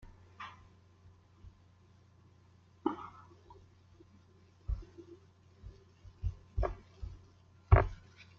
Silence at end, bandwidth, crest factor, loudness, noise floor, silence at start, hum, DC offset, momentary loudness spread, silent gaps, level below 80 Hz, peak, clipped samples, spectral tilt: 0.45 s; 6.8 kHz; 30 dB; -37 LUFS; -63 dBFS; 0.4 s; none; under 0.1%; 31 LU; none; -44 dBFS; -10 dBFS; under 0.1%; -7.5 dB/octave